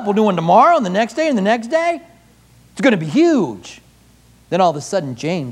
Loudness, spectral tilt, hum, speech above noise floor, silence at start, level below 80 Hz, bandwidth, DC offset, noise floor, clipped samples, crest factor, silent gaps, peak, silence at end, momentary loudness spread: -16 LUFS; -6 dB/octave; none; 34 dB; 0 s; -58 dBFS; 12.5 kHz; under 0.1%; -49 dBFS; under 0.1%; 16 dB; none; 0 dBFS; 0 s; 11 LU